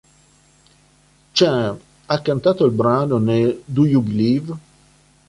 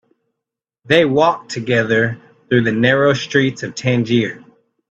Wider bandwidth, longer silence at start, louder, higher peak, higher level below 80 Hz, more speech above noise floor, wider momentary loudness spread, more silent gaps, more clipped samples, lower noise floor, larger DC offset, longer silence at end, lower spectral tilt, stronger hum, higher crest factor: first, 11.5 kHz vs 8.4 kHz; first, 1.35 s vs 0.85 s; about the same, -18 LUFS vs -16 LUFS; second, -4 dBFS vs 0 dBFS; about the same, -54 dBFS vs -56 dBFS; second, 38 dB vs 67 dB; about the same, 8 LU vs 8 LU; neither; neither; second, -55 dBFS vs -82 dBFS; neither; first, 0.7 s vs 0.5 s; about the same, -7 dB/octave vs -6 dB/octave; neither; about the same, 16 dB vs 18 dB